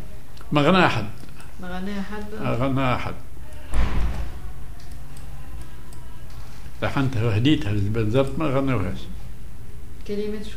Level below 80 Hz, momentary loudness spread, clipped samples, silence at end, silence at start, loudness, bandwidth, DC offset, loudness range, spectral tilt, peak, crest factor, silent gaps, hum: -34 dBFS; 22 LU; under 0.1%; 0 s; 0 s; -24 LUFS; 15.5 kHz; 5%; 10 LU; -7 dB/octave; -4 dBFS; 22 dB; none; none